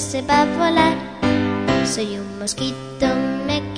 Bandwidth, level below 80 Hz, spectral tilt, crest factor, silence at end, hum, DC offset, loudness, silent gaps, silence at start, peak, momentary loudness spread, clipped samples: 10.5 kHz; -44 dBFS; -4.5 dB/octave; 16 dB; 0 s; none; 0.2%; -20 LUFS; none; 0 s; -4 dBFS; 9 LU; under 0.1%